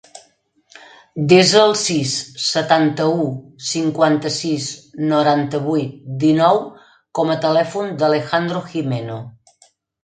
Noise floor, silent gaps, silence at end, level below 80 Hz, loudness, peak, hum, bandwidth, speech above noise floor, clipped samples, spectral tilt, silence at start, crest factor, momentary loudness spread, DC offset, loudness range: -58 dBFS; none; 0.75 s; -62 dBFS; -17 LUFS; 0 dBFS; none; 9.4 kHz; 41 dB; under 0.1%; -4.5 dB/octave; 0.15 s; 18 dB; 12 LU; under 0.1%; 3 LU